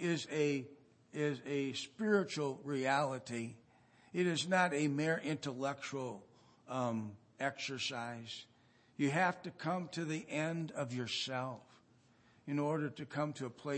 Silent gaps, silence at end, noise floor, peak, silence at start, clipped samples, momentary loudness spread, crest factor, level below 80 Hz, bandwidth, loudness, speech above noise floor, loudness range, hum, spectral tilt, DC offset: none; 0 s; -68 dBFS; -18 dBFS; 0 s; under 0.1%; 12 LU; 22 dB; -84 dBFS; 8.4 kHz; -38 LUFS; 31 dB; 5 LU; none; -5 dB/octave; under 0.1%